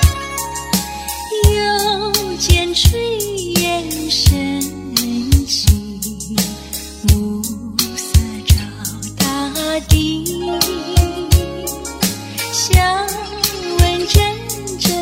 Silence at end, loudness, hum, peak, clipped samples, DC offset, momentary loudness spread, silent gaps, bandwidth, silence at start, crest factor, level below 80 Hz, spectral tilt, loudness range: 0 s; -17 LUFS; none; 0 dBFS; under 0.1%; under 0.1%; 9 LU; none; 16.5 kHz; 0 s; 16 dB; -22 dBFS; -4 dB/octave; 2 LU